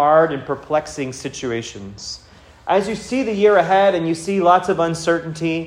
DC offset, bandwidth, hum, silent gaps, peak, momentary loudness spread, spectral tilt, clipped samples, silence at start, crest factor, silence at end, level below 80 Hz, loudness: under 0.1%; 14 kHz; none; none; -2 dBFS; 16 LU; -5 dB/octave; under 0.1%; 0 s; 16 dB; 0 s; -52 dBFS; -18 LUFS